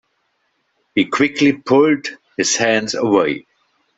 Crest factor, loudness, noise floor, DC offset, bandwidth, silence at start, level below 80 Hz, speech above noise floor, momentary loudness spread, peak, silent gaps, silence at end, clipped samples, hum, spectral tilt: 16 dB; -16 LUFS; -67 dBFS; under 0.1%; 8.2 kHz; 0.95 s; -60 dBFS; 51 dB; 8 LU; -2 dBFS; none; 0.55 s; under 0.1%; none; -3.5 dB/octave